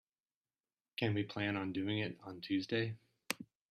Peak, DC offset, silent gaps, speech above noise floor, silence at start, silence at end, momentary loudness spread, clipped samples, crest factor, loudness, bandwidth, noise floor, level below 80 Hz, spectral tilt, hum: -16 dBFS; under 0.1%; none; over 52 dB; 1 s; 0.25 s; 8 LU; under 0.1%; 26 dB; -39 LUFS; 14 kHz; under -90 dBFS; -76 dBFS; -5.5 dB/octave; none